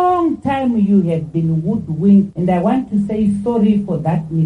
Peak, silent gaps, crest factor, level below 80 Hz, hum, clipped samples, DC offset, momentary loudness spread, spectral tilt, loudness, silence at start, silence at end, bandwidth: -2 dBFS; none; 12 dB; -44 dBFS; none; under 0.1%; under 0.1%; 6 LU; -10 dB/octave; -16 LUFS; 0 s; 0 s; 9 kHz